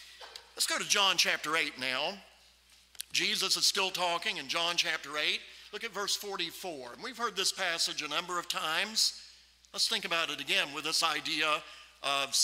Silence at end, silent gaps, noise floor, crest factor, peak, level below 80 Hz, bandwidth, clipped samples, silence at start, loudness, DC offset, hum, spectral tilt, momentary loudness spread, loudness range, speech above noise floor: 0 s; none; -62 dBFS; 22 dB; -12 dBFS; -72 dBFS; 16 kHz; under 0.1%; 0 s; -30 LUFS; under 0.1%; none; 0 dB/octave; 15 LU; 3 LU; 30 dB